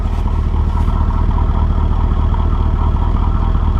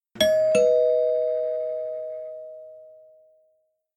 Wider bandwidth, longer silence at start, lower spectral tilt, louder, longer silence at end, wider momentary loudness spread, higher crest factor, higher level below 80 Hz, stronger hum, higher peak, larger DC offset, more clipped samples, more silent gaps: second, 4.6 kHz vs 12.5 kHz; second, 0 s vs 0.15 s; first, -9 dB/octave vs -3 dB/octave; first, -17 LUFS vs -23 LUFS; second, 0 s vs 1.05 s; second, 1 LU vs 20 LU; second, 10 dB vs 18 dB; first, -14 dBFS vs -62 dBFS; neither; first, -2 dBFS vs -8 dBFS; neither; neither; neither